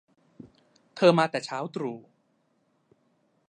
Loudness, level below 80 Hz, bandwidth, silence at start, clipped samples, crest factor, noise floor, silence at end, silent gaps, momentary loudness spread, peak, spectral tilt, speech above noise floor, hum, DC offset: -26 LUFS; -78 dBFS; 9.8 kHz; 0.95 s; under 0.1%; 24 dB; -71 dBFS; 1.5 s; none; 21 LU; -6 dBFS; -6 dB/octave; 46 dB; none; under 0.1%